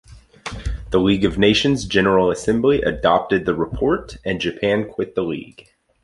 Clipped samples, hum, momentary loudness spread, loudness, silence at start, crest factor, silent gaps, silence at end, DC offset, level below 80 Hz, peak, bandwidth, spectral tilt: under 0.1%; none; 13 LU; -19 LUFS; 0.1 s; 18 dB; none; 0.6 s; under 0.1%; -36 dBFS; -2 dBFS; 11.5 kHz; -5.5 dB/octave